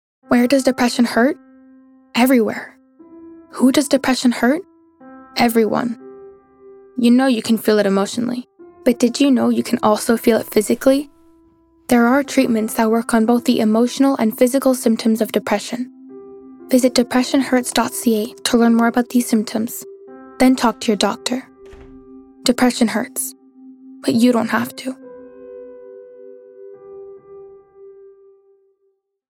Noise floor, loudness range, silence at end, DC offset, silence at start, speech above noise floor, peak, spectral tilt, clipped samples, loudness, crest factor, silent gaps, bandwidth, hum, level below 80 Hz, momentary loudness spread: -66 dBFS; 4 LU; 1.45 s; under 0.1%; 0.3 s; 50 dB; -2 dBFS; -4 dB/octave; under 0.1%; -17 LUFS; 16 dB; none; 18.5 kHz; none; -54 dBFS; 17 LU